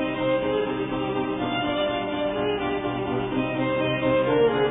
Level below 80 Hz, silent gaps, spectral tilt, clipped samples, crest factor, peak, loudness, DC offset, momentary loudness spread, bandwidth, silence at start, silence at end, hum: -48 dBFS; none; -10 dB/octave; under 0.1%; 14 dB; -10 dBFS; -25 LUFS; under 0.1%; 6 LU; 3.9 kHz; 0 s; 0 s; none